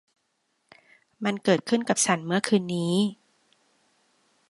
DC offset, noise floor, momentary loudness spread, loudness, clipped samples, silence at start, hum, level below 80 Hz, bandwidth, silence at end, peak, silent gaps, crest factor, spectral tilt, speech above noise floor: under 0.1%; -74 dBFS; 6 LU; -25 LUFS; under 0.1%; 1.2 s; none; -72 dBFS; 11.5 kHz; 1.35 s; -6 dBFS; none; 22 dB; -4 dB/octave; 50 dB